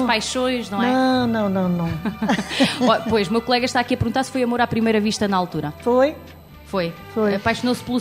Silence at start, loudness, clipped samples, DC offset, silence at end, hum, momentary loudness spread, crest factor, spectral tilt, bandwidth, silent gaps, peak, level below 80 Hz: 0 s; -20 LUFS; under 0.1%; under 0.1%; 0 s; none; 7 LU; 18 dB; -5 dB/octave; 15 kHz; none; -2 dBFS; -46 dBFS